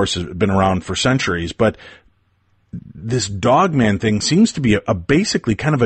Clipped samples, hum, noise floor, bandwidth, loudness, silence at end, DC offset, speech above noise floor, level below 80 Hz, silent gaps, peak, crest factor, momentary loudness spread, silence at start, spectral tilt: under 0.1%; none; -60 dBFS; 8.8 kHz; -17 LUFS; 0 s; under 0.1%; 44 dB; -42 dBFS; none; -4 dBFS; 14 dB; 7 LU; 0 s; -5 dB/octave